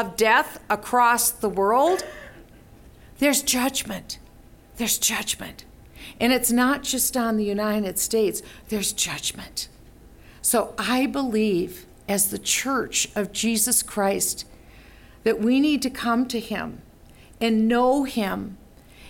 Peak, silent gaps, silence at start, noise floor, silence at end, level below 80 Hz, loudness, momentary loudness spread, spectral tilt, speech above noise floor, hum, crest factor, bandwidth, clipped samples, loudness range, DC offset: -6 dBFS; none; 0 s; -49 dBFS; 0 s; -50 dBFS; -22 LUFS; 13 LU; -2.5 dB/octave; 26 dB; none; 18 dB; 17 kHz; under 0.1%; 3 LU; under 0.1%